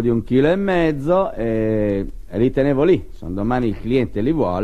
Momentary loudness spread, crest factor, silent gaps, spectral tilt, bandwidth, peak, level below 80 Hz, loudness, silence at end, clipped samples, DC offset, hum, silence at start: 5 LU; 14 dB; none; -9 dB/octave; 9.6 kHz; -4 dBFS; -34 dBFS; -19 LUFS; 0 s; under 0.1%; 2%; none; 0 s